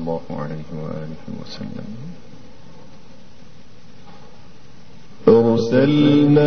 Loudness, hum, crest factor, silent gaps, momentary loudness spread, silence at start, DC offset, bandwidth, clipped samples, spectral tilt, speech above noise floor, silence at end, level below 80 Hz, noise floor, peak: -17 LUFS; none; 20 dB; none; 20 LU; 0 s; 2%; 6.6 kHz; under 0.1%; -8 dB/octave; 27 dB; 0 s; -52 dBFS; -46 dBFS; -2 dBFS